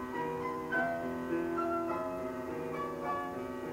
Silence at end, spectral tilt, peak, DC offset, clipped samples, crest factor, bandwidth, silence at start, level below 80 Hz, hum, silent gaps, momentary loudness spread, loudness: 0 s; -6.5 dB/octave; -20 dBFS; under 0.1%; under 0.1%; 16 dB; 16 kHz; 0 s; -62 dBFS; none; none; 6 LU; -36 LUFS